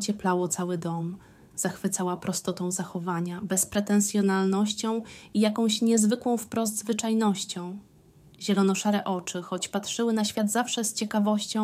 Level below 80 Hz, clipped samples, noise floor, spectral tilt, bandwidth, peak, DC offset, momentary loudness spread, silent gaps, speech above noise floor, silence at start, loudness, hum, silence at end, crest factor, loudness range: -66 dBFS; under 0.1%; -55 dBFS; -4.5 dB/octave; 16 kHz; -10 dBFS; under 0.1%; 8 LU; none; 29 dB; 0 s; -27 LUFS; none; 0 s; 16 dB; 4 LU